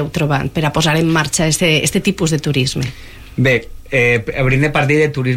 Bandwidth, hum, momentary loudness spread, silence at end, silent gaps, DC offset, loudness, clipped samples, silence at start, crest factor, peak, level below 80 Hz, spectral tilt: 16.5 kHz; none; 5 LU; 0 s; none; under 0.1%; -15 LUFS; under 0.1%; 0 s; 12 dB; -2 dBFS; -36 dBFS; -4.5 dB/octave